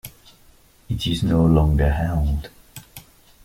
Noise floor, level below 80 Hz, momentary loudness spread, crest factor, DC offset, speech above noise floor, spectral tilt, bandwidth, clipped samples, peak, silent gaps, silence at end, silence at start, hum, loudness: -52 dBFS; -28 dBFS; 23 LU; 16 dB; under 0.1%; 34 dB; -7 dB/octave; 16 kHz; under 0.1%; -6 dBFS; none; 0.45 s; 0.05 s; none; -20 LUFS